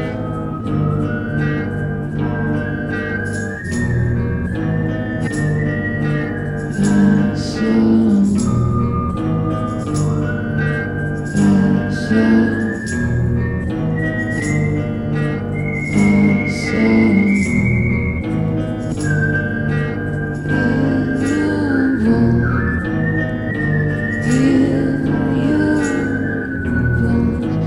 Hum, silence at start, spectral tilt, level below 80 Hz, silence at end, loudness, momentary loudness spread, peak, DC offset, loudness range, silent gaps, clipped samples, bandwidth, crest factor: none; 0 s; -7.5 dB/octave; -32 dBFS; 0 s; -17 LUFS; 7 LU; -2 dBFS; under 0.1%; 4 LU; none; under 0.1%; 11.5 kHz; 14 dB